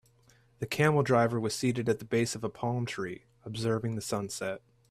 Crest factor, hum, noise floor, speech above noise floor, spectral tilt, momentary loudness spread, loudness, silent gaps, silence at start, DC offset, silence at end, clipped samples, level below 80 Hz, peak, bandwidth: 18 dB; none; -63 dBFS; 33 dB; -5.5 dB/octave; 13 LU; -30 LUFS; none; 0.6 s; under 0.1%; 0.35 s; under 0.1%; -64 dBFS; -12 dBFS; 14.5 kHz